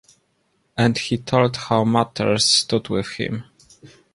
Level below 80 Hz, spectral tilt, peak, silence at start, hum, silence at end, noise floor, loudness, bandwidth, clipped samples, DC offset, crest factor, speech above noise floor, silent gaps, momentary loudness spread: -54 dBFS; -4 dB/octave; -2 dBFS; 0.75 s; none; 0.25 s; -67 dBFS; -19 LUFS; 11.5 kHz; under 0.1%; under 0.1%; 18 dB; 47 dB; none; 12 LU